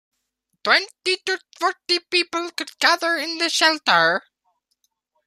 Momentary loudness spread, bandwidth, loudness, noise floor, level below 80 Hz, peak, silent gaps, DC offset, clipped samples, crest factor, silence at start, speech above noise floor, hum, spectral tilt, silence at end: 10 LU; 15 kHz; -20 LUFS; -75 dBFS; -80 dBFS; -2 dBFS; none; under 0.1%; under 0.1%; 20 dB; 0.65 s; 54 dB; none; -1 dB/octave; 1.05 s